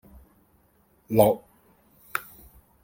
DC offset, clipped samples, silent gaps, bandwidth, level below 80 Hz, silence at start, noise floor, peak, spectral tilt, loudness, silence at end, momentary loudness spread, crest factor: under 0.1%; under 0.1%; none; 17 kHz; -58 dBFS; 1.1 s; -63 dBFS; -6 dBFS; -6.5 dB/octave; -25 LUFS; 0.65 s; 13 LU; 24 dB